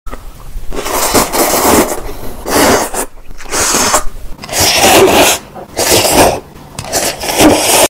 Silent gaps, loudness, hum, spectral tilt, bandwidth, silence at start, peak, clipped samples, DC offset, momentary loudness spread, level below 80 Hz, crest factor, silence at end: none; -9 LUFS; none; -2 dB/octave; over 20 kHz; 0.05 s; 0 dBFS; 0.2%; under 0.1%; 18 LU; -28 dBFS; 12 dB; 0 s